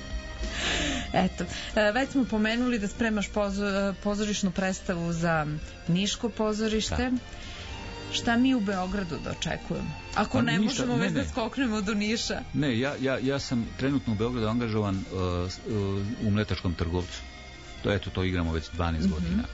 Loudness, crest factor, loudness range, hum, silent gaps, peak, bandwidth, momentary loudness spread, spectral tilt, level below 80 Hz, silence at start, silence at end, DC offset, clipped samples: -28 LUFS; 18 dB; 3 LU; none; none; -10 dBFS; 8 kHz; 8 LU; -5 dB/octave; -42 dBFS; 0 s; 0 s; under 0.1%; under 0.1%